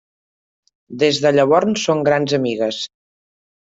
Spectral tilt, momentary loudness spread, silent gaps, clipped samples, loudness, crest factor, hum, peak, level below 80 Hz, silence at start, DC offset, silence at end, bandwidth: -4.5 dB/octave; 12 LU; none; under 0.1%; -17 LUFS; 16 dB; none; -2 dBFS; -60 dBFS; 0.9 s; under 0.1%; 0.8 s; 8 kHz